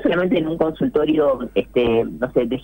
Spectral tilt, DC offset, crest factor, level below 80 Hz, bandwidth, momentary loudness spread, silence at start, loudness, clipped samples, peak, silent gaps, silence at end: -8.5 dB/octave; under 0.1%; 12 dB; -44 dBFS; 16 kHz; 4 LU; 0 s; -19 LUFS; under 0.1%; -6 dBFS; none; 0 s